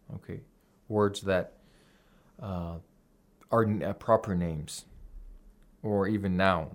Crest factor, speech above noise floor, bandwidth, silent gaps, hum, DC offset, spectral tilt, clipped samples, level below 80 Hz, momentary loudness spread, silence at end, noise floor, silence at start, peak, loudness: 22 dB; 35 dB; 16 kHz; none; none; under 0.1%; -6.5 dB/octave; under 0.1%; -56 dBFS; 17 LU; 0 s; -64 dBFS; 0.1 s; -10 dBFS; -30 LUFS